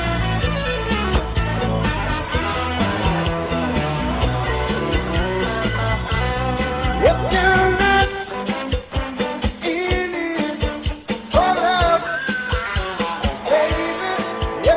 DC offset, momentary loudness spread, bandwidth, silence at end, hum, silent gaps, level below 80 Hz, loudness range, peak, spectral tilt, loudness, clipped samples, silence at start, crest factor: under 0.1%; 7 LU; 4 kHz; 0 s; none; none; -28 dBFS; 3 LU; -2 dBFS; -10 dB/octave; -20 LUFS; under 0.1%; 0 s; 16 dB